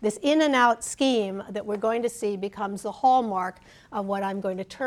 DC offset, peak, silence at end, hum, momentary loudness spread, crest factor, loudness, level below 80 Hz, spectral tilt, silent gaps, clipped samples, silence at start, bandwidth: under 0.1%; -8 dBFS; 0 s; none; 11 LU; 18 dB; -25 LUFS; -64 dBFS; -4 dB/octave; none; under 0.1%; 0 s; 14.5 kHz